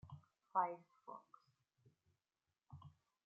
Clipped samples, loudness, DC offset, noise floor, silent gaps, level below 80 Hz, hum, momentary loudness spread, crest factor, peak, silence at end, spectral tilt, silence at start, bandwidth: under 0.1%; -43 LUFS; under 0.1%; under -90 dBFS; none; -84 dBFS; none; 22 LU; 26 dB; -24 dBFS; 0.35 s; -6 dB/octave; 0.05 s; 6.4 kHz